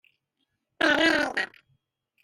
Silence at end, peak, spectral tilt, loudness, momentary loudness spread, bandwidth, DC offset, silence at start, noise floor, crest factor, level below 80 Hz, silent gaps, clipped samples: 0.8 s; -10 dBFS; -2.5 dB/octave; -23 LUFS; 10 LU; 15.5 kHz; under 0.1%; 0.8 s; -79 dBFS; 18 dB; -62 dBFS; none; under 0.1%